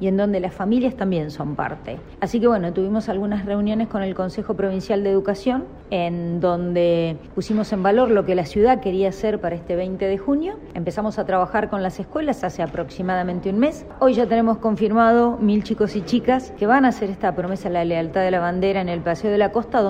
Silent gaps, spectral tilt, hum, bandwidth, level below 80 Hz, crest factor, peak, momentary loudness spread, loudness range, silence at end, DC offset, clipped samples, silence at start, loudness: none; -7.5 dB/octave; none; 9.4 kHz; -44 dBFS; 16 dB; -4 dBFS; 9 LU; 4 LU; 0 s; under 0.1%; under 0.1%; 0 s; -21 LUFS